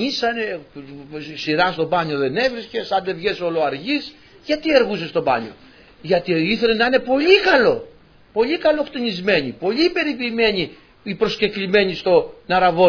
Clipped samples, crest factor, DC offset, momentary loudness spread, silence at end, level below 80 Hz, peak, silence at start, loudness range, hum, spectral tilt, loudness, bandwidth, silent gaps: under 0.1%; 18 dB; under 0.1%; 13 LU; 0 s; -50 dBFS; 0 dBFS; 0 s; 4 LU; none; -5.5 dB/octave; -19 LUFS; 5.4 kHz; none